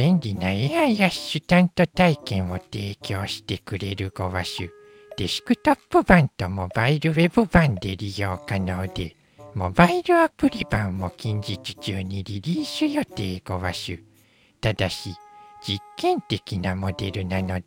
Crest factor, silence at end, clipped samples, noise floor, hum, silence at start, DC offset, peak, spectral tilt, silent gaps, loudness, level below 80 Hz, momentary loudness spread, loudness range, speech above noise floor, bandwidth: 22 dB; 0.05 s; under 0.1%; -58 dBFS; none; 0 s; under 0.1%; -2 dBFS; -6 dB/octave; none; -23 LUFS; -44 dBFS; 13 LU; 7 LU; 36 dB; 16.5 kHz